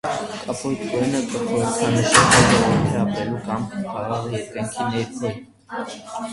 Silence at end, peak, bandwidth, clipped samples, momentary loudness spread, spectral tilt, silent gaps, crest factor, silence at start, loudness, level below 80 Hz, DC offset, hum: 0 s; 0 dBFS; 11.5 kHz; under 0.1%; 17 LU; -4 dB/octave; none; 20 dB; 0.05 s; -20 LUFS; -44 dBFS; under 0.1%; none